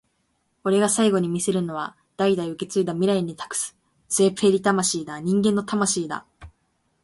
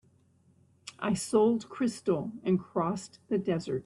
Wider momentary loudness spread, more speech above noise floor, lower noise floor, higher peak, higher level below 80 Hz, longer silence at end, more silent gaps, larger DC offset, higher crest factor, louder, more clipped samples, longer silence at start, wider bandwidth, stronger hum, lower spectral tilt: about the same, 11 LU vs 11 LU; first, 48 dB vs 35 dB; first, -70 dBFS vs -65 dBFS; first, -6 dBFS vs -12 dBFS; first, -60 dBFS vs -68 dBFS; first, 0.55 s vs 0.05 s; neither; neither; about the same, 18 dB vs 18 dB; first, -23 LUFS vs -30 LUFS; neither; second, 0.65 s vs 0.85 s; about the same, 12 kHz vs 12.5 kHz; neither; second, -4.5 dB/octave vs -6 dB/octave